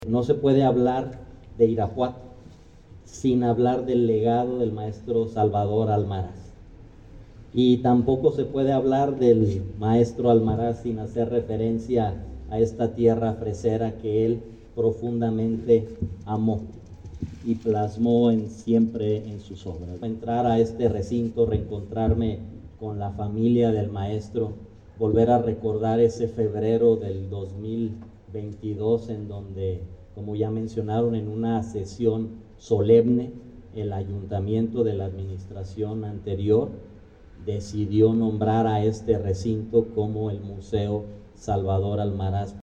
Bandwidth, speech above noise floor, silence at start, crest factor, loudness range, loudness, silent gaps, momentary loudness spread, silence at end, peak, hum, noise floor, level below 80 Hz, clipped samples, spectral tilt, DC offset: 8.4 kHz; 24 dB; 0 s; 18 dB; 5 LU; -24 LUFS; none; 15 LU; 0 s; -6 dBFS; none; -48 dBFS; -48 dBFS; under 0.1%; -8.5 dB/octave; under 0.1%